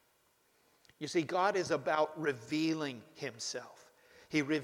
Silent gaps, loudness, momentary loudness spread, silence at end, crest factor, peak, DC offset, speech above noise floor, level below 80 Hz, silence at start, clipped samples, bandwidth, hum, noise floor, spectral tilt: none; -35 LUFS; 13 LU; 0 s; 18 dB; -18 dBFS; under 0.1%; 38 dB; -78 dBFS; 1 s; under 0.1%; 14.5 kHz; none; -72 dBFS; -4.5 dB/octave